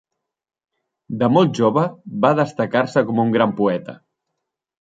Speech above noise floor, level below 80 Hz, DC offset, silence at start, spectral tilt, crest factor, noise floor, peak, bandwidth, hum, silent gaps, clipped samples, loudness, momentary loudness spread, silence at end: 61 dB; -64 dBFS; under 0.1%; 1.1 s; -7.5 dB/octave; 18 dB; -79 dBFS; -2 dBFS; 7.8 kHz; none; none; under 0.1%; -18 LUFS; 8 LU; 0.85 s